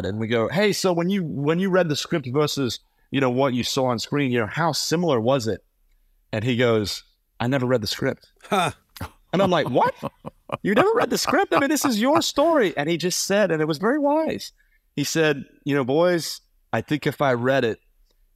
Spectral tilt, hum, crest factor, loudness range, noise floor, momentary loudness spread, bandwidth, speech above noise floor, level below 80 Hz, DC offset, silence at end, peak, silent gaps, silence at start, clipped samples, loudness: -4.5 dB/octave; none; 20 dB; 4 LU; -62 dBFS; 11 LU; 16 kHz; 40 dB; -58 dBFS; under 0.1%; 0.6 s; -2 dBFS; none; 0 s; under 0.1%; -22 LUFS